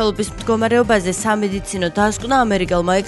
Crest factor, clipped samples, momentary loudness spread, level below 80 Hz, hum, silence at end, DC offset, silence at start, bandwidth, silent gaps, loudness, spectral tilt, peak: 14 dB; under 0.1%; 6 LU; -36 dBFS; none; 0 s; under 0.1%; 0 s; 12 kHz; none; -17 LUFS; -4.5 dB/octave; -2 dBFS